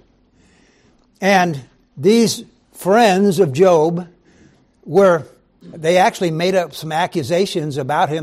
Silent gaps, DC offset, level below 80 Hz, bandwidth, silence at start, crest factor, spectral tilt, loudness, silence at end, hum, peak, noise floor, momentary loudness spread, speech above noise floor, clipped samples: none; under 0.1%; -60 dBFS; 15 kHz; 1.2 s; 14 dB; -5 dB/octave; -16 LUFS; 0 s; none; -2 dBFS; -55 dBFS; 9 LU; 39 dB; under 0.1%